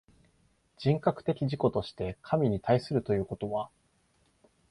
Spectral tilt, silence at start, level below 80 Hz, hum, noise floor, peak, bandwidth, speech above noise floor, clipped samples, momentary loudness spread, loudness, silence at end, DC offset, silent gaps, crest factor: -8.5 dB/octave; 0.8 s; -56 dBFS; none; -70 dBFS; -12 dBFS; 11.5 kHz; 40 dB; under 0.1%; 8 LU; -30 LUFS; 1.05 s; under 0.1%; none; 18 dB